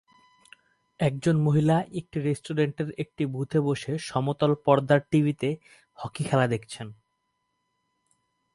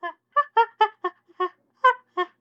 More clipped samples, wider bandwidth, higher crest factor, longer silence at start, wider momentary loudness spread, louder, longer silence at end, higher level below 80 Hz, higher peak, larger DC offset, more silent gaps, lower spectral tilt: neither; first, 11.5 kHz vs 8.6 kHz; about the same, 22 dB vs 20 dB; first, 1 s vs 0.05 s; first, 12 LU vs 9 LU; about the same, -26 LUFS vs -24 LUFS; first, 1.6 s vs 0.15 s; first, -62 dBFS vs under -90 dBFS; about the same, -6 dBFS vs -6 dBFS; neither; neither; first, -7 dB/octave vs -2 dB/octave